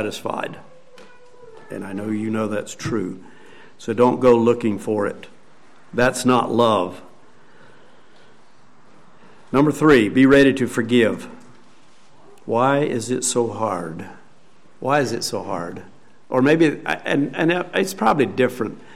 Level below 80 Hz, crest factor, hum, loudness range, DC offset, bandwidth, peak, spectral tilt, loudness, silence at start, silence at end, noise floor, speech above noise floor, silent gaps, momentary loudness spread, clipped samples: -52 dBFS; 16 dB; none; 7 LU; 0.8%; 15.5 kHz; -4 dBFS; -5 dB/octave; -19 LUFS; 0 s; 0.15 s; -54 dBFS; 35 dB; none; 17 LU; under 0.1%